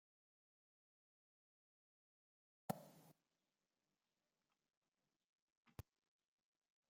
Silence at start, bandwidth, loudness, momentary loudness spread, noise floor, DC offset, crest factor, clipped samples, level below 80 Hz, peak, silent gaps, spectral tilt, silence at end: 2.7 s; 15.5 kHz; -55 LUFS; 13 LU; under -90 dBFS; under 0.1%; 36 dB; under 0.1%; -82 dBFS; -28 dBFS; 4.77-4.82 s, 5.24-5.63 s; -6 dB/octave; 1.2 s